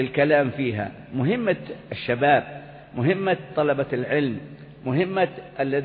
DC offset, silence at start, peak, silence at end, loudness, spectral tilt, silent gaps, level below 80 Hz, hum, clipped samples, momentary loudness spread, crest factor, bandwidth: under 0.1%; 0 s; -6 dBFS; 0 s; -24 LUFS; -11.5 dB/octave; none; -60 dBFS; none; under 0.1%; 15 LU; 18 dB; 5 kHz